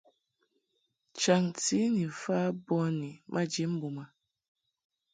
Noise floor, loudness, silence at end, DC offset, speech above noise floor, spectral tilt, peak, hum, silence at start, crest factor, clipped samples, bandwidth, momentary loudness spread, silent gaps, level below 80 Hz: -79 dBFS; -31 LUFS; 1.05 s; under 0.1%; 49 dB; -5 dB/octave; -12 dBFS; none; 1.15 s; 20 dB; under 0.1%; 9.6 kHz; 10 LU; none; -74 dBFS